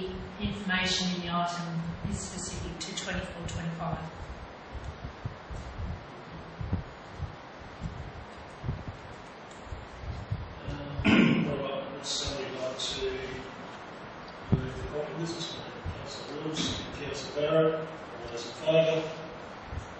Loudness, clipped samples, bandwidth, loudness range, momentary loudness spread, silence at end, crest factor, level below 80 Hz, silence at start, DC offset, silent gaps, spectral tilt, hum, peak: -33 LUFS; under 0.1%; 8.8 kHz; 11 LU; 17 LU; 0 s; 24 dB; -48 dBFS; 0 s; under 0.1%; none; -5 dB/octave; none; -10 dBFS